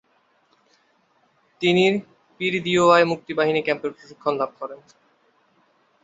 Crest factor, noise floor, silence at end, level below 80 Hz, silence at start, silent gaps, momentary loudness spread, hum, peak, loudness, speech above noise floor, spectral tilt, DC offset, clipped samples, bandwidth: 20 dB; -64 dBFS; 1.3 s; -68 dBFS; 1.6 s; none; 13 LU; none; -2 dBFS; -21 LUFS; 43 dB; -5 dB/octave; under 0.1%; under 0.1%; 8 kHz